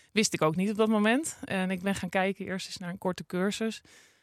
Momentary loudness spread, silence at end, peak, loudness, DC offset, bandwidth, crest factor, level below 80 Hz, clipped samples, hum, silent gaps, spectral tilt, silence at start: 10 LU; 0.45 s; -10 dBFS; -29 LUFS; under 0.1%; 15 kHz; 18 dB; -68 dBFS; under 0.1%; none; none; -4.5 dB/octave; 0.15 s